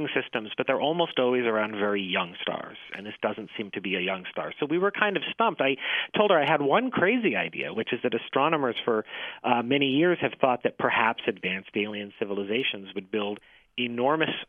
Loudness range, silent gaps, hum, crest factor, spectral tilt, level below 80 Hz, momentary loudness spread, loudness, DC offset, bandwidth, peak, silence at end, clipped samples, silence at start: 5 LU; none; none; 24 dB; -7.5 dB/octave; -74 dBFS; 10 LU; -26 LUFS; under 0.1%; 4.3 kHz; -4 dBFS; 0.05 s; under 0.1%; 0 s